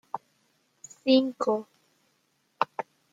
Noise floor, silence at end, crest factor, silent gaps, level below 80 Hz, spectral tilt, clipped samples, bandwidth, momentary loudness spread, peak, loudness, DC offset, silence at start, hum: -72 dBFS; 0.3 s; 24 dB; none; -82 dBFS; -4.5 dB/octave; under 0.1%; 7.8 kHz; 18 LU; -6 dBFS; -27 LUFS; under 0.1%; 0.15 s; none